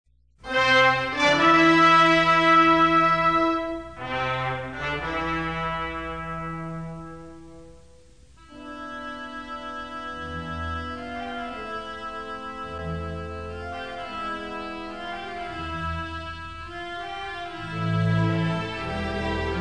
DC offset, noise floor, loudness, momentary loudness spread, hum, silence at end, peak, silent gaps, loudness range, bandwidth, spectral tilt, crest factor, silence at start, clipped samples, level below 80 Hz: 0.3%; -53 dBFS; -24 LUFS; 18 LU; none; 0 s; -6 dBFS; none; 18 LU; 10 kHz; -5.5 dB/octave; 18 dB; 0.4 s; under 0.1%; -46 dBFS